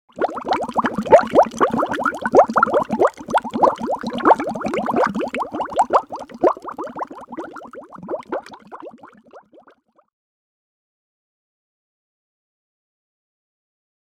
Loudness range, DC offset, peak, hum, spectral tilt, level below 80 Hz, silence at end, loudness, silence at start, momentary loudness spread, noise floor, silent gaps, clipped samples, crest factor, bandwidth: 18 LU; under 0.1%; 0 dBFS; none; -5.5 dB/octave; -56 dBFS; 4.75 s; -19 LUFS; 0.15 s; 19 LU; -55 dBFS; none; under 0.1%; 22 dB; 13.5 kHz